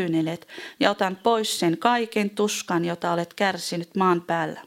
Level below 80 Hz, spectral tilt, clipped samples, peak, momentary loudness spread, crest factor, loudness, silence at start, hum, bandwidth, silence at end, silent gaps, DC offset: -72 dBFS; -4.5 dB/octave; under 0.1%; -4 dBFS; 6 LU; 20 dB; -24 LUFS; 0 s; none; 17 kHz; 0.05 s; none; under 0.1%